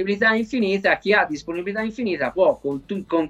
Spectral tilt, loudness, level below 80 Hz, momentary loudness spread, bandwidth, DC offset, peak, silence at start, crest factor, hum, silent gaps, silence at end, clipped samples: -5.5 dB/octave; -21 LUFS; -54 dBFS; 9 LU; 10 kHz; under 0.1%; -4 dBFS; 0 s; 16 dB; none; none; 0 s; under 0.1%